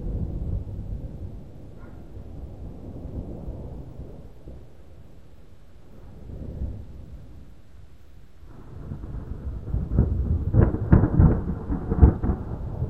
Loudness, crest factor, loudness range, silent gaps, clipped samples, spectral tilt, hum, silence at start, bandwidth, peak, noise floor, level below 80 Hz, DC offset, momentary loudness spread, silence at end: -25 LUFS; 26 dB; 20 LU; none; under 0.1%; -11.5 dB/octave; none; 0 s; 3 kHz; 0 dBFS; -50 dBFS; -30 dBFS; 0.6%; 25 LU; 0 s